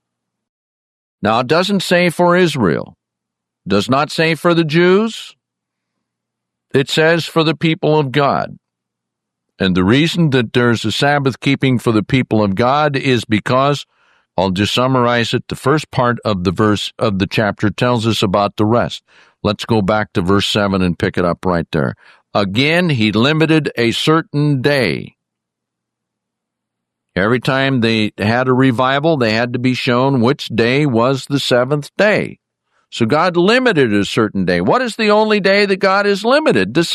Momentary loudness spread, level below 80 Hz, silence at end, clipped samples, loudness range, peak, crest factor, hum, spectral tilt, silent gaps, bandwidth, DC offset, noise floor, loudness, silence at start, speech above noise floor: 6 LU; -52 dBFS; 0 s; under 0.1%; 2 LU; 0 dBFS; 14 dB; none; -6 dB/octave; none; 14 kHz; under 0.1%; -80 dBFS; -15 LUFS; 1.2 s; 65 dB